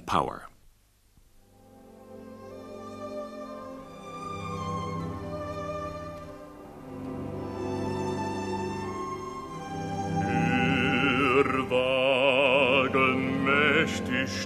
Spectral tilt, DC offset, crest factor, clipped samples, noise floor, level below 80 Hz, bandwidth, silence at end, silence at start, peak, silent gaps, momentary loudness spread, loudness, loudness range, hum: -5.5 dB/octave; under 0.1%; 20 dB; under 0.1%; -61 dBFS; -54 dBFS; 14 kHz; 0 s; 0 s; -10 dBFS; none; 21 LU; -27 LUFS; 18 LU; none